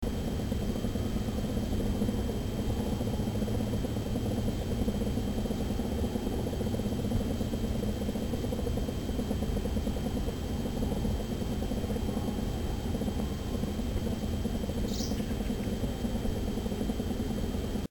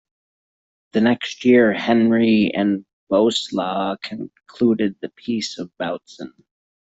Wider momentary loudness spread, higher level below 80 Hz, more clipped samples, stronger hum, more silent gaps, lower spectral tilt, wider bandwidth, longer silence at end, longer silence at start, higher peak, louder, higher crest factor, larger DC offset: second, 2 LU vs 16 LU; first, -36 dBFS vs -60 dBFS; neither; neither; second, none vs 2.93-3.07 s; about the same, -6.5 dB/octave vs -5.5 dB/octave; first, 19 kHz vs 8 kHz; second, 0 s vs 0.55 s; second, 0 s vs 0.95 s; second, -16 dBFS vs -4 dBFS; second, -33 LUFS vs -19 LUFS; about the same, 14 dB vs 16 dB; first, 0.2% vs under 0.1%